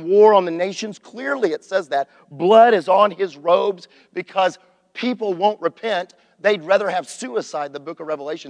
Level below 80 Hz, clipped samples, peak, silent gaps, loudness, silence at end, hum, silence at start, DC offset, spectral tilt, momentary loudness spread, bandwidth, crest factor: -78 dBFS; under 0.1%; -2 dBFS; none; -19 LUFS; 0 s; none; 0 s; under 0.1%; -4.5 dB/octave; 17 LU; 10 kHz; 18 dB